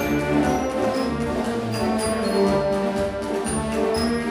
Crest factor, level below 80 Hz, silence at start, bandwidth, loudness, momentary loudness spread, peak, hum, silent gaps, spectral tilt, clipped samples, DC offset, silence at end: 14 dB; -40 dBFS; 0 s; 16 kHz; -23 LUFS; 4 LU; -8 dBFS; none; none; -5.5 dB/octave; under 0.1%; under 0.1%; 0 s